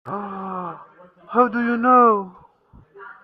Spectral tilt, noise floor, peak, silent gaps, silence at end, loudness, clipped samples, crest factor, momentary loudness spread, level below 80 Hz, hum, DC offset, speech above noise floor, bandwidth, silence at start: -9.5 dB/octave; -52 dBFS; -2 dBFS; none; 0.1 s; -19 LUFS; under 0.1%; 18 dB; 20 LU; -64 dBFS; none; under 0.1%; 35 dB; 4.9 kHz; 0.05 s